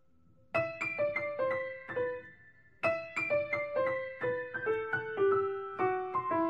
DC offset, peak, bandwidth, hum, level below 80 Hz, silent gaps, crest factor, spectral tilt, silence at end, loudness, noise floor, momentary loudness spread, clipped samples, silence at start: under 0.1%; -18 dBFS; 8.6 kHz; none; -72 dBFS; none; 16 dB; -6.5 dB/octave; 0 s; -33 LUFS; -67 dBFS; 6 LU; under 0.1%; 0.55 s